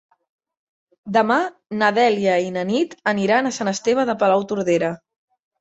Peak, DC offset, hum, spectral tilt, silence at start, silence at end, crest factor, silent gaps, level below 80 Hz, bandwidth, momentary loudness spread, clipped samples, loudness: -2 dBFS; under 0.1%; none; -5 dB/octave; 1.05 s; 0.65 s; 18 dB; none; -66 dBFS; 8.2 kHz; 5 LU; under 0.1%; -20 LUFS